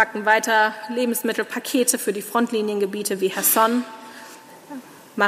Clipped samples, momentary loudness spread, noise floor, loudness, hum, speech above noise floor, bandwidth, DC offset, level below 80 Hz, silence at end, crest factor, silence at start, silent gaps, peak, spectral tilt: under 0.1%; 22 LU; -43 dBFS; -21 LUFS; none; 21 dB; 16 kHz; under 0.1%; -76 dBFS; 0 s; 18 dB; 0 s; none; -4 dBFS; -2.5 dB/octave